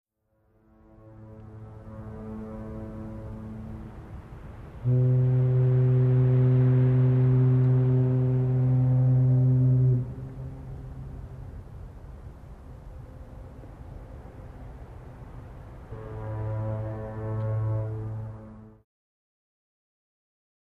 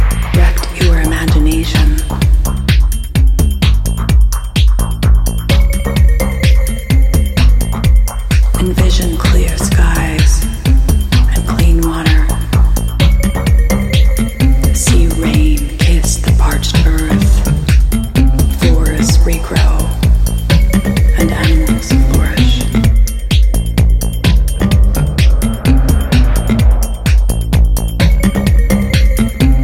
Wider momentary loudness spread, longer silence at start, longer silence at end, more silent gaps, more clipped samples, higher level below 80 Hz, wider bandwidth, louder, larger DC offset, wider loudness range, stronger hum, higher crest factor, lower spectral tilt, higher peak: first, 24 LU vs 2 LU; first, 1.05 s vs 0 s; first, 2.1 s vs 0 s; neither; neither; second, -46 dBFS vs -10 dBFS; second, 2.6 kHz vs 16 kHz; second, -24 LUFS vs -12 LUFS; neither; first, 22 LU vs 1 LU; neither; about the same, 14 dB vs 10 dB; first, -11.5 dB/octave vs -5.5 dB/octave; second, -14 dBFS vs 0 dBFS